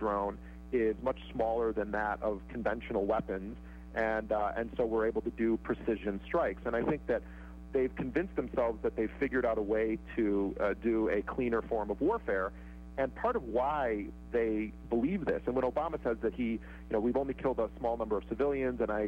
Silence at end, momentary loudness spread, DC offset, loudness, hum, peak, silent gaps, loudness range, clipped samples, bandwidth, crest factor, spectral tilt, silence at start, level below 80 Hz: 0 s; 5 LU; under 0.1%; -33 LUFS; none; -20 dBFS; none; 2 LU; under 0.1%; 7.8 kHz; 12 dB; -8.5 dB/octave; 0 s; -48 dBFS